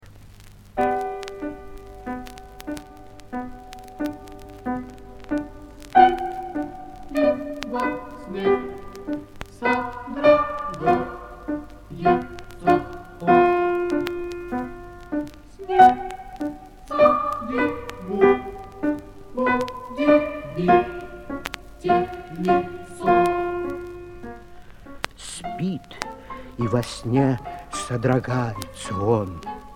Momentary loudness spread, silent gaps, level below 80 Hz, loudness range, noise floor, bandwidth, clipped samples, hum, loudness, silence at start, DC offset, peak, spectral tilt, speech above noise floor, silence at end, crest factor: 20 LU; none; -46 dBFS; 10 LU; -45 dBFS; 16.5 kHz; under 0.1%; none; -23 LUFS; 0.05 s; under 0.1%; -2 dBFS; -6.5 dB/octave; 21 dB; 0 s; 22 dB